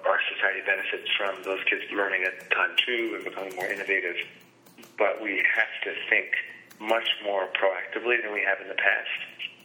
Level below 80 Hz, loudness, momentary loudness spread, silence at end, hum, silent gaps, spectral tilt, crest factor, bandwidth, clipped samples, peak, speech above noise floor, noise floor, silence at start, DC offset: -84 dBFS; -26 LUFS; 9 LU; 0.1 s; none; none; -2.5 dB/octave; 22 dB; 19.5 kHz; under 0.1%; -6 dBFS; 25 dB; -52 dBFS; 0 s; under 0.1%